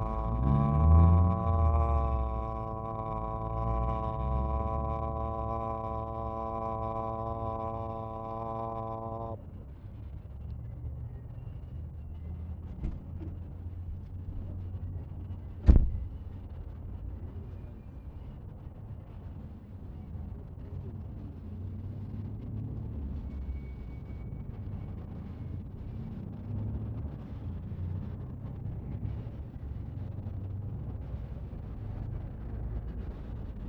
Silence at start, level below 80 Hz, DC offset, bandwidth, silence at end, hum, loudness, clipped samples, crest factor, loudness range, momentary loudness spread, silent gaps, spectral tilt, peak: 0 s; -36 dBFS; under 0.1%; 3.9 kHz; 0 s; none; -35 LUFS; under 0.1%; 28 dB; 11 LU; 16 LU; none; -11 dB/octave; -4 dBFS